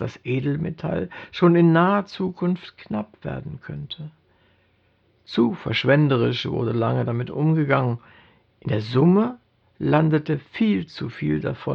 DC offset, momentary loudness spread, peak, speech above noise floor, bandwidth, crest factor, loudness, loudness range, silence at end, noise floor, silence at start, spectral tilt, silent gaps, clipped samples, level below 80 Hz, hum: under 0.1%; 15 LU; -4 dBFS; 41 dB; 6.6 kHz; 18 dB; -22 LUFS; 7 LU; 0 s; -63 dBFS; 0 s; -8.5 dB/octave; none; under 0.1%; -54 dBFS; none